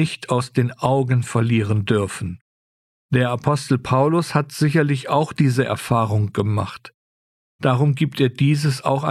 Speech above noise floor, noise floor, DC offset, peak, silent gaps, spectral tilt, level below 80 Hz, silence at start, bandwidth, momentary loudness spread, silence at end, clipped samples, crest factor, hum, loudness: over 71 dB; under -90 dBFS; under 0.1%; -4 dBFS; 2.41-3.09 s, 6.94-7.59 s; -6.5 dB/octave; -54 dBFS; 0 s; 13.5 kHz; 5 LU; 0 s; under 0.1%; 16 dB; none; -20 LUFS